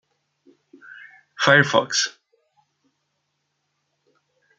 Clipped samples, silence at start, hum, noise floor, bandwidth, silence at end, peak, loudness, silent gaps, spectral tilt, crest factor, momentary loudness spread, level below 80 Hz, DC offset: under 0.1%; 1.4 s; none; -75 dBFS; 9.4 kHz; 2.5 s; 0 dBFS; -18 LUFS; none; -3 dB/octave; 24 dB; 26 LU; -70 dBFS; under 0.1%